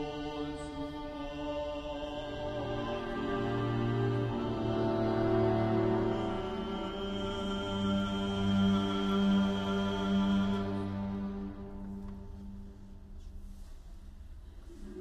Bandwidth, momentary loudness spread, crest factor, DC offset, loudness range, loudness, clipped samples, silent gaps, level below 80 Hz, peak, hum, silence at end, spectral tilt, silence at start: 8.8 kHz; 22 LU; 16 dB; under 0.1%; 12 LU; -33 LUFS; under 0.1%; none; -48 dBFS; -18 dBFS; none; 0 s; -7.5 dB/octave; 0 s